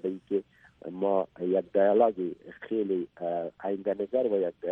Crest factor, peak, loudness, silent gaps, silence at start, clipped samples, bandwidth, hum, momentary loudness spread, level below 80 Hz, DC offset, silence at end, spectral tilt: 18 dB; -10 dBFS; -29 LUFS; none; 0.05 s; under 0.1%; 3.9 kHz; none; 11 LU; -72 dBFS; under 0.1%; 0 s; -9.5 dB/octave